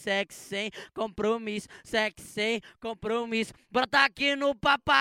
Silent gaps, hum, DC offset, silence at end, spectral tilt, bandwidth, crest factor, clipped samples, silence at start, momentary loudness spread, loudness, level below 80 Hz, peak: none; none; under 0.1%; 0 s; -3.5 dB/octave; 16.5 kHz; 22 dB; under 0.1%; 0 s; 13 LU; -28 LUFS; -58 dBFS; -8 dBFS